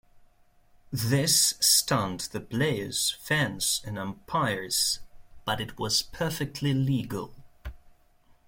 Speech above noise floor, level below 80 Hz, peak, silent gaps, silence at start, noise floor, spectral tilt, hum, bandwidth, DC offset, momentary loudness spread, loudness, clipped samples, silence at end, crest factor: 33 dB; -52 dBFS; -8 dBFS; none; 0.15 s; -60 dBFS; -3 dB/octave; none; 16.5 kHz; under 0.1%; 16 LU; -26 LUFS; under 0.1%; 0.6 s; 20 dB